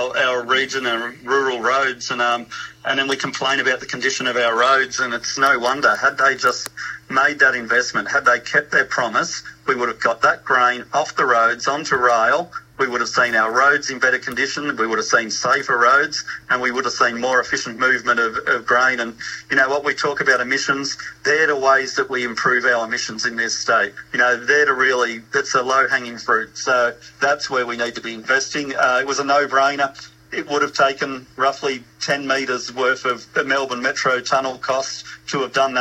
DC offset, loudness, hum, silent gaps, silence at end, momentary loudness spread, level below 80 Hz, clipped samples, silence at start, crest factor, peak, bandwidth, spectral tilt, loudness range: under 0.1%; -18 LUFS; none; none; 0 s; 8 LU; -60 dBFS; under 0.1%; 0 s; 18 dB; -2 dBFS; 15.5 kHz; -2 dB/octave; 3 LU